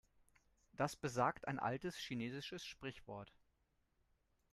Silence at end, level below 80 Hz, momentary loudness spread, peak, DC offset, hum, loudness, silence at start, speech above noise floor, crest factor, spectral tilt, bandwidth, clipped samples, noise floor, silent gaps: 1.25 s; -72 dBFS; 15 LU; -24 dBFS; under 0.1%; none; -44 LUFS; 0.75 s; 38 dB; 22 dB; -5 dB/octave; 13 kHz; under 0.1%; -81 dBFS; none